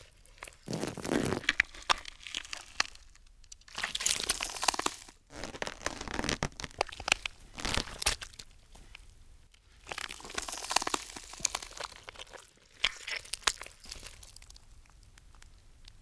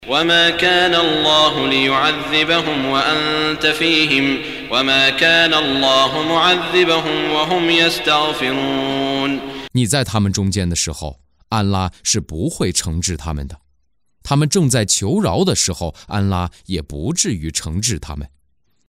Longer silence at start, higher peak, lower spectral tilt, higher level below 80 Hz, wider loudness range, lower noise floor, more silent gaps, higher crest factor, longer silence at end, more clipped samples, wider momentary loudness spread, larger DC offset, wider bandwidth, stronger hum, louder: about the same, 0 s vs 0 s; about the same, -4 dBFS vs -2 dBFS; second, -1.5 dB/octave vs -3.5 dB/octave; second, -52 dBFS vs -38 dBFS; about the same, 4 LU vs 6 LU; second, -59 dBFS vs -68 dBFS; neither; first, 34 dB vs 14 dB; second, 0 s vs 0.65 s; neither; first, 20 LU vs 11 LU; neither; second, 11 kHz vs 16 kHz; neither; second, -34 LUFS vs -15 LUFS